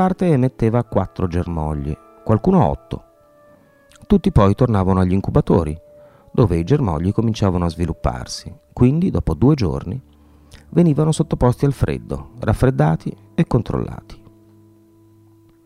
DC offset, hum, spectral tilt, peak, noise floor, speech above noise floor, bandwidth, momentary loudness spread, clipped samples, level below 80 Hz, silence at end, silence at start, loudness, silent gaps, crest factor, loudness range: under 0.1%; none; -8 dB/octave; 0 dBFS; -50 dBFS; 33 dB; 13 kHz; 13 LU; under 0.1%; -32 dBFS; 1.5 s; 0 s; -18 LUFS; none; 18 dB; 4 LU